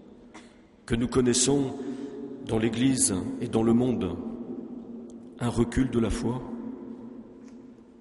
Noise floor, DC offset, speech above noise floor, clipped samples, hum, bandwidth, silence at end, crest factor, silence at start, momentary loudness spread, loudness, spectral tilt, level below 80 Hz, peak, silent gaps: -52 dBFS; under 0.1%; 27 dB; under 0.1%; none; 11.5 kHz; 0.1 s; 18 dB; 0 s; 20 LU; -27 LUFS; -4.5 dB/octave; -46 dBFS; -10 dBFS; none